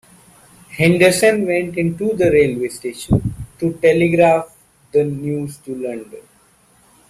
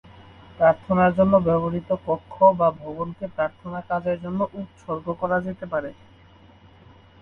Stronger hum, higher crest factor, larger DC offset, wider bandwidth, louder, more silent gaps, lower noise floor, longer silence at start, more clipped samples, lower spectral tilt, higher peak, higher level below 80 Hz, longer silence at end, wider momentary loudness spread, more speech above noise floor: neither; about the same, 16 dB vs 20 dB; neither; first, 15 kHz vs 4.2 kHz; first, -17 LUFS vs -23 LUFS; neither; about the same, -53 dBFS vs -51 dBFS; first, 0.7 s vs 0.55 s; neither; second, -6 dB/octave vs -9.5 dB/octave; about the same, -2 dBFS vs -4 dBFS; first, -42 dBFS vs -52 dBFS; second, 0.9 s vs 1.3 s; about the same, 15 LU vs 14 LU; first, 37 dB vs 28 dB